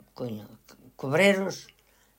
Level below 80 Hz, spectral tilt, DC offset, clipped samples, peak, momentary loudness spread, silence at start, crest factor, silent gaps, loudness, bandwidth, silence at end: -70 dBFS; -5 dB/octave; under 0.1%; under 0.1%; -10 dBFS; 19 LU; 0.2 s; 20 dB; none; -26 LUFS; 16 kHz; 0.55 s